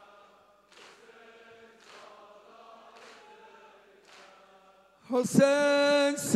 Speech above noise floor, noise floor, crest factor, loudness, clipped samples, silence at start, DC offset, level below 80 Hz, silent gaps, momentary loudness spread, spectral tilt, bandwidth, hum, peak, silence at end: 36 dB; -60 dBFS; 22 dB; -25 LUFS; under 0.1%; 5.1 s; under 0.1%; -80 dBFS; none; 28 LU; -4 dB/octave; 14 kHz; none; -8 dBFS; 0 s